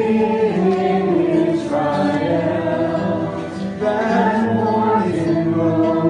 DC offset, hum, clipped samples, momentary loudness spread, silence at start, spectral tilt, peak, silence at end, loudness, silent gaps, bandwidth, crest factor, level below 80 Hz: under 0.1%; none; under 0.1%; 4 LU; 0 s; -8 dB/octave; -4 dBFS; 0 s; -18 LUFS; none; 10.5 kHz; 12 dB; -54 dBFS